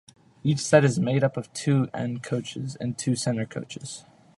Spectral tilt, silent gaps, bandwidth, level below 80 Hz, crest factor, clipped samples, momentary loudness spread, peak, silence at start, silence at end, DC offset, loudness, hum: -5.5 dB/octave; none; 11.5 kHz; -64 dBFS; 24 dB; under 0.1%; 16 LU; -2 dBFS; 0.45 s; 0.4 s; under 0.1%; -26 LUFS; none